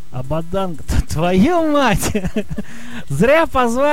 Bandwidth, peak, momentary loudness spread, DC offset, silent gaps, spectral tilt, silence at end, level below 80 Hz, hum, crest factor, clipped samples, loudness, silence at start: 16.5 kHz; -4 dBFS; 14 LU; 7%; none; -5.5 dB/octave; 0 s; -30 dBFS; none; 14 dB; under 0.1%; -17 LUFS; 0.1 s